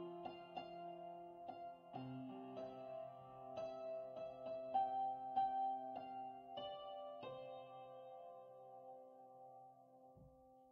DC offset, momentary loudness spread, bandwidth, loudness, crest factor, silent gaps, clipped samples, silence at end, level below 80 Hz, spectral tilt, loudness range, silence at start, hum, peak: under 0.1%; 19 LU; 6.4 kHz; -49 LUFS; 20 dB; none; under 0.1%; 0 s; -84 dBFS; -4 dB/octave; 11 LU; 0 s; none; -30 dBFS